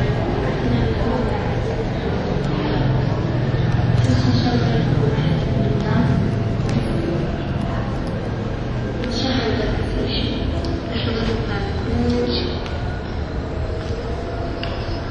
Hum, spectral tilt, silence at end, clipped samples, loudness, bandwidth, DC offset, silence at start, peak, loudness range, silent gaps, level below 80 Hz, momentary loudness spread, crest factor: none; -7.5 dB/octave; 0 s; under 0.1%; -21 LUFS; 10 kHz; under 0.1%; 0 s; -4 dBFS; 4 LU; none; -30 dBFS; 8 LU; 16 dB